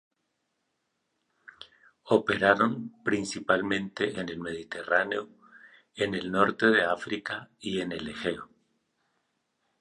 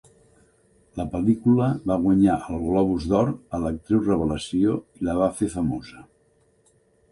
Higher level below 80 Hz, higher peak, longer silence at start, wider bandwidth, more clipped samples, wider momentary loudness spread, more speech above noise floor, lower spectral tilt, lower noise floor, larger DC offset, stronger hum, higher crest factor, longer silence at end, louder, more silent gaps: second, -64 dBFS vs -44 dBFS; about the same, -6 dBFS vs -6 dBFS; first, 1.6 s vs 0.95 s; about the same, 11.5 kHz vs 11.5 kHz; neither; first, 14 LU vs 9 LU; first, 51 dB vs 40 dB; second, -5 dB/octave vs -7.5 dB/octave; first, -79 dBFS vs -62 dBFS; neither; neither; first, 24 dB vs 16 dB; first, 1.35 s vs 1.1 s; second, -28 LUFS vs -23 LUFS; neither